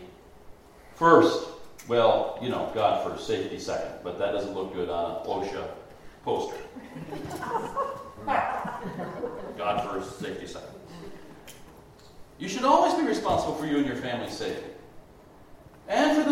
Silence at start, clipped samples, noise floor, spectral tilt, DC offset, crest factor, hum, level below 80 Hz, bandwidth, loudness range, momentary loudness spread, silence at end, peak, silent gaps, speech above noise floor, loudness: 0 s; under 0.1%; -52 dBFS; -5 dB/octave; under 0.1%; 24 dB; none; -56 dBFS; 16 kHz; 9 LU; 21 LU; 0 s; -4 dBFS; none; 25 dB; -27 LUFS